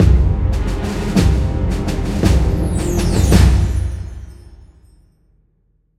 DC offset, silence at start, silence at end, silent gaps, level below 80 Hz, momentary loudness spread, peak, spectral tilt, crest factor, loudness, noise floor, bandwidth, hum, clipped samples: under 0.1%; 0 s; 1.45 s; none; -18 dBFS; 10 LU; 0 dBFS; -6.5 dB/octave; 16 dB; -17 LUFS; -60 dBFS; 14.5 kHz; none; under 0.1%